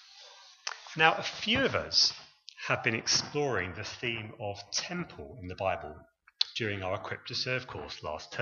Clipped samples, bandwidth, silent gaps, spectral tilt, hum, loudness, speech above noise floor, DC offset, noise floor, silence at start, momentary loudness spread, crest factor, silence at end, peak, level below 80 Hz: under 0.1%; 7.6 kHz; none; -2.5 dB/octave; none; -31 LUFS; 22 dB; under 0.1%; -54 dBFS; 0 s; 17 LU; 26 dB; 0 s; -6 dBFS; -62 dBFS